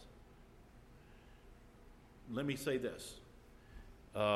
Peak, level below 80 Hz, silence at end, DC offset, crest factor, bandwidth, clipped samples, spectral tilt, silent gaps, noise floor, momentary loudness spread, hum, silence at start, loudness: -20 dBFS; -62 dBFS; 0 s; under 0.1%; 24 dB; 16 kHz; under 0.1%; -5 dB/octave; none; -61 dBFS; 24 LU; none; 0 s; -41 LUFS